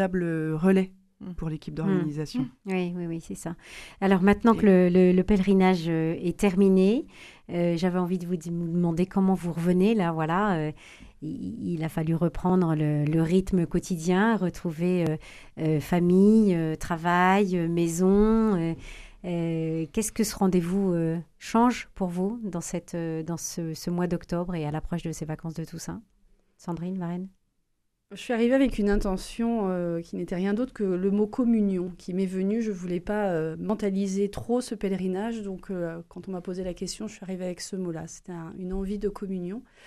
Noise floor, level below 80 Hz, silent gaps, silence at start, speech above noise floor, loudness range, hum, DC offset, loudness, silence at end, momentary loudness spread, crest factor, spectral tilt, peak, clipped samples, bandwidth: -74 dBFS; -46 dBFS; none; 0 s; 48 dB; 10 LU; none; under 0.1%; -26 LUFS; 0.25 s; 15 LU; 18 dB; -7 dB/octave; -6 dBFS; under 0.1%; 13.5 kHz